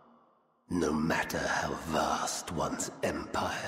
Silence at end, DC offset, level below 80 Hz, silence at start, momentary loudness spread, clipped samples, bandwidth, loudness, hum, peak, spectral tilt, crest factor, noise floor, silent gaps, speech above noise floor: 0 s; under 0.1%; -56 dBFS; 0.7 s; 4 LU; under 0.1%; 16 kHz; -32 LUFS; none; -18 dBFS; -4 dB/octave; 16 dB; -67 dBFS; none; 35 dB